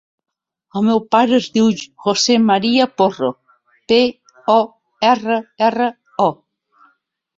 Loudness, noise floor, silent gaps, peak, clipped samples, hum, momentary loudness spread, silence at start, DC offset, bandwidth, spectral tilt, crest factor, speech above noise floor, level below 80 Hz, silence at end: -16 LUFS; -62 dBFS; none; -2 dBFS; under 0.1%; none; 8 LU; 0.75 s; under 0.1%; 7.8 kHz; -4 dB/octave; 16 dB; 47 dB; -60 dBFS; 1.05 s